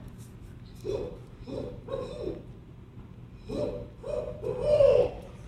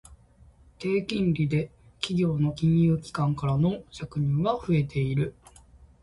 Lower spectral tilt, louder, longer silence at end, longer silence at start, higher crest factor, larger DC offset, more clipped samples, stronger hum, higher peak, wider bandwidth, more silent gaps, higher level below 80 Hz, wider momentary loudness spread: about the same, -7.5 dB/octave vs -7.5 dB/octave; second, -30 LUFS vs -27 LUFS; second, 0 s vs 0.2 s; about the same, 0 s vs 0.1 s; about the same, 20 dB vs 16 dB; neither; neither; neither; about the same, -10 dBFS vs -10 dBFS; about the same, 10.5 kHz vs 11.5 kHz; neither; about the same, -48 dBFS vs -50 dBFS; first, 25 LU vs 10 LU